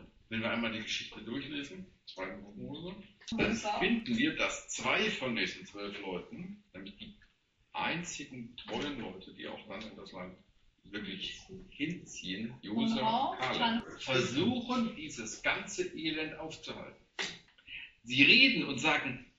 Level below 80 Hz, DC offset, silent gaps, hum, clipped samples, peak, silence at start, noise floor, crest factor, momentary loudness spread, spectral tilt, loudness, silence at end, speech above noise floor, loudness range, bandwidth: -62 dBFS; under 0.1%; none; none; under 0.1%; -8 dBFS; 0 s; -70 dBFS; 26 dB; 17 LU; -2 dB/octave; -33 LUFS; 0.15 s; 36 dB; 13 LU; 8 kHz